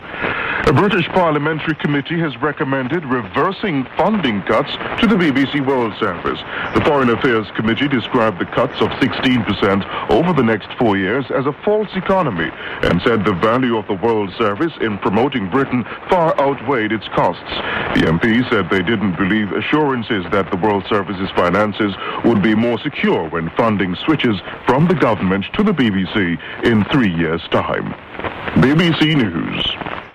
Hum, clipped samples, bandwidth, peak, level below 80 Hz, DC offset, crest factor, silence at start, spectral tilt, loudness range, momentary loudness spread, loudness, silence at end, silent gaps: none; under 0.1%; 11 kHz; -4 dBFS; -42 dBFS; under 0.1%; 12 dB; 0 s; -7.5 dB/octave; 1 LU; 6 LU; -17 LUFS; 0.05 s; none